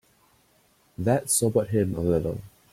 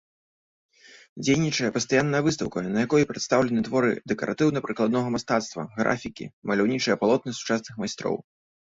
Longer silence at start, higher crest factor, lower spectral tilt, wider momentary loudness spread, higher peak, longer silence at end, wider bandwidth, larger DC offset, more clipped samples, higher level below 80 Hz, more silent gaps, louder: second, 1 s vs 1.15 s; about the same, 18 dB vs 18 dB; about the same, -5.5 dB/octave vs -5 dB/octave; about the same, 9 LU vs 8 LU; about the same, -8 dBFS vs -6 dBFS; second, 0.25 s vs 0.55 s; first, 16.5 kHz vs 8 kHz; neither; neither; first, -52 dBFS vs -60 dBFS; second, none vs 6.33-6.42 s; about the same, -25 LUFS vs -25 LUFS